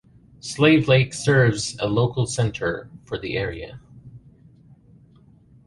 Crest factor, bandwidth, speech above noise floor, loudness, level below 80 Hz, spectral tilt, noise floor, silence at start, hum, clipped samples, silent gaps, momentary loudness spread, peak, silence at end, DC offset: 18 dB; 11.5 kHz; 32 dB; -21 LUFS; -48 dBFS; -5.5 dB/octave; -52 dBFS; 0.45 s; none; under 0.1%; none; 17 LU; -4 dBFS; 1.5 s; under 0.1%